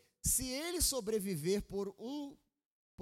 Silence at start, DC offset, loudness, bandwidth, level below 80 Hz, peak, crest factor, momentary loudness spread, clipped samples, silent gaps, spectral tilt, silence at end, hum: 0.25 s; under 0.1%; -36 LUFS; 16.5 kHz; -52 dBFS; -18 dBFS; 20 dB; 11 LU; under 0.1%; 2.66-2.98 s; -3 dB/octave; 0 s; none